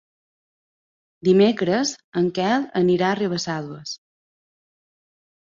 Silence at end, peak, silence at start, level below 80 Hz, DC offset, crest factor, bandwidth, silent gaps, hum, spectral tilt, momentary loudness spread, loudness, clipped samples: 1.45 s; -6 dBFS; 1.25 s; -64 dBFS; under 0.1%; 18 dB; 7.6 kHz; 2.04-2.12 s; none; -5.5 dB/octave; 15 LU; -21 LUFS; under 0.1%